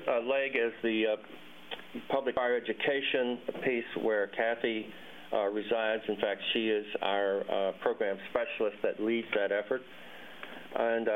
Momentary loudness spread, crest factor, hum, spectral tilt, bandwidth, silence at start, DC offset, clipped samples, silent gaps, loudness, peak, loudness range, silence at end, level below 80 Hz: 14 LU; 18 dB; none; -6 dB/octave; 15.5 kHz; 0 s; 0.1%; under 0.1%; none; -32 LUFS; -14 dBFS; 1 LU; 0 s; -72 dBFS